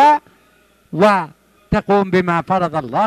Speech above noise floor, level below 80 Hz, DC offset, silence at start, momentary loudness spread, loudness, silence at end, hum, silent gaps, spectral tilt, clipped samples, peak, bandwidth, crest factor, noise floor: 38 dB; -42 dBFS; under 0.1%; 0 s; 7 LU; -16 LUFS; 0 s; none; none; -7 dB/octave; under 0.1%; -2 dBFS; 13.5 kHz; 14 dB; -54 dBFS